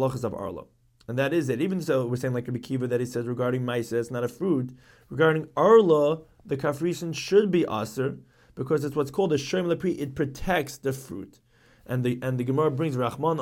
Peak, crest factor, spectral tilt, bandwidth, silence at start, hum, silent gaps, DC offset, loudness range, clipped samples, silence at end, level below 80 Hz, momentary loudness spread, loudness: -6 dBFS; 20 dB; -6.5 dB/octave; 16.5 kHz; 0 s; none; none; under 0.1%; 6 LU; under 0.1%; 0 s; -54 dBFS; 12 LU; -26 LUFS